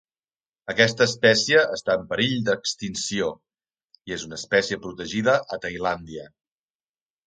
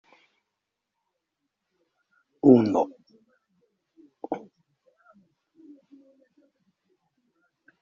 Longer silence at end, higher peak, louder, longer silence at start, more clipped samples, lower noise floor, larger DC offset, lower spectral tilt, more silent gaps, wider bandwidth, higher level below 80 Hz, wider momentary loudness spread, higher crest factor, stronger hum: second, 1 s vs 3.45 s; about the same, -2 dBFS vs -4 dBFS; about the same, -23 LUFS vs -23 LUFS; second, 0.65 s vs 2.45 s; neither; first, under -90 dBFS vs -84 dBFS; neither; second, -3.5 dB/octave vs -8.5 dB/octave; neither; first, 9.4 kHz vs 7.2 kHz; first, -58 dBFS vs -72 dBFS; second, 14 LU vs 19 LU; about the same, 22 dB vs 26 dB; neither